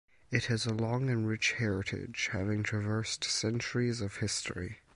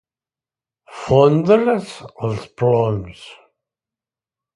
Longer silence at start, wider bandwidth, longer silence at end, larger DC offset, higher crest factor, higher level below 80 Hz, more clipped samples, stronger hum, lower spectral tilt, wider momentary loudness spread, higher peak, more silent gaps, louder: second, 0.3 s vs 0.9 s; about the same, 11 kHz vs 11.5 kHz; second, 0.2 s vs 1.2 s; neither; about the same, 20 dB vs 18 dB; second, -56 dBFS vs -50 dBFS; neither; neither; second, -4.5 dB/octave vs -7.5 dB/octave; second, 5 LU vs 18 LU; second, -14 dBFS vs 0 dBFS; neither; second, -33 LUFS vs -17 LUFS